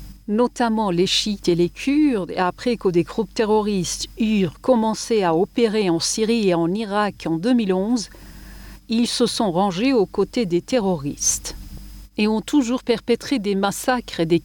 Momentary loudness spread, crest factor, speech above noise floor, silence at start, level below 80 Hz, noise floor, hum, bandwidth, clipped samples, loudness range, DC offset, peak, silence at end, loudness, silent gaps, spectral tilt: 5 LU; 14 dB; 20 dB; 0 s; -44 dBFS; -40 dBFS; none; 19 kHz; under 0.1%; 2 LU; under 0.1%; -6 dBFS; 0 s; -20 LUFS; none; -4.5 dB/octave